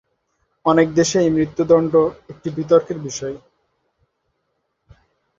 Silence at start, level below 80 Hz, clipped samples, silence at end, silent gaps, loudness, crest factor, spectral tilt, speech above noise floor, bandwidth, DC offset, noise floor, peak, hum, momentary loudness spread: 0.65 s; -54 dBFS; under 0.1%; 2 s; none; -18 LUFS; 18 dB; -5.5 dB/octave; 55 dB; 7.8 kHz; under 0.1%; -72 dBFS; -2 dBFS; none; 14 LU